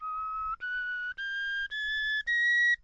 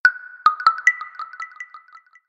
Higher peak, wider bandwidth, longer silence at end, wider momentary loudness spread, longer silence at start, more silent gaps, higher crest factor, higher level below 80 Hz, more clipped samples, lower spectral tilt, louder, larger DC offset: second, -20 dBFS vs -2 dBFS; second, 8.2 kHz vs 11 kHz; second, 0.1 s vs 0.5 s; second, 10 LU vs 19 LU; about the same, 0 s vs 0.05 s; neither; second, 10 dB vs 20 dB; first, -58 dBFS vs -74 dBFS; neither; about the same, 2.5 dB/octave vs 2.5 dB/octave; second, -29 LUFS vs -18 LUFS; neither